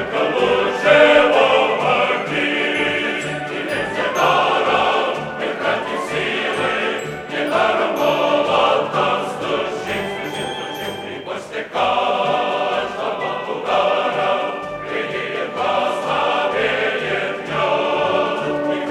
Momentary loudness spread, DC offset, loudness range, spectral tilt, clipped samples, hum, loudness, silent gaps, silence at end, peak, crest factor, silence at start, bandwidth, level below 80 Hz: 9 LU; under 0.1%; 6 LU; -4 dB/octave; under 0.1%; none; -18 LUFS; none; 0 s; 0 dBFS; 18 dB; 0 s; 14.5 kHz; -54 dBFS